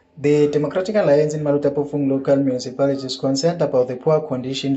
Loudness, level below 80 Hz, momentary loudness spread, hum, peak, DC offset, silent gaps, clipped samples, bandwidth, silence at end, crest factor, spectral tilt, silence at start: -19 LUFS; -62 dBFS; 5 LU; none; -6 dBFS; under 0.1%; none; under 0.1%; 8.2 kHz; 0 s; 14 dB; -6.5 dB/octave; 0.15 s